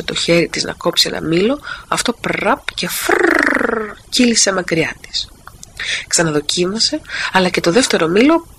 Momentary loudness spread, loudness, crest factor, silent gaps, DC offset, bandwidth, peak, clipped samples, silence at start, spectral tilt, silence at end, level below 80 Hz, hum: 9 LU; -15 LUFS; 16 dB; none; under 0.1%; 15.5 kHz; 0 dBFS; under 0.1%; 0 s; -3 dB/octave; 0.15 s; -44 dBFS; none